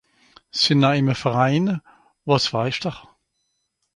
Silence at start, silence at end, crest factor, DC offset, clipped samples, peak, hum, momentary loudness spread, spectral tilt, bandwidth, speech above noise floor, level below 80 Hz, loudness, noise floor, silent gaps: 0.55 s; 0.95 s; 20 dB; under 0.1%; under 0.1%; -2 dBFS; none; 13 LU; -5.5 dB/octave; 11 kHz; 53 dB; -58 dBFS; -20 LUFS; -73 dBFS; none